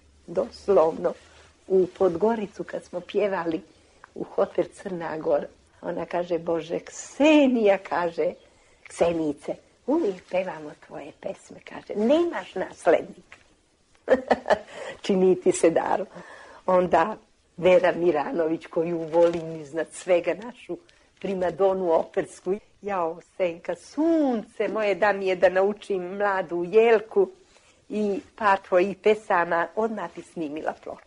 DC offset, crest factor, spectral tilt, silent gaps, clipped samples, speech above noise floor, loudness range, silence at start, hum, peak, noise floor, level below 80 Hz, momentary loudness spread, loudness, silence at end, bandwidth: under 0.1%; 18 dB; -5.5 dB/octave; none; under 0.1%; 38 dB; 6 LU; 0.3 s; none; -6 dBFS; -62 dBFS; -62 dBFS; 16 LU; -25 LUFS; 0.1 s; 10.5 kHz